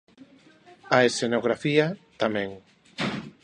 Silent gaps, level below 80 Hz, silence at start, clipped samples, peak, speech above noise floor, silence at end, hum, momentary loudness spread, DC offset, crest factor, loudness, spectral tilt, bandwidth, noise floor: none; -64 dBFS; 0.85 s; under 0.1%; -4 dBFS; 30 dB; 0.15 s; none; 10 LU; under 0.1%; 24 dB; -25 LUFS; -4.5 dB/octave; 11 kHz; -54 dBFS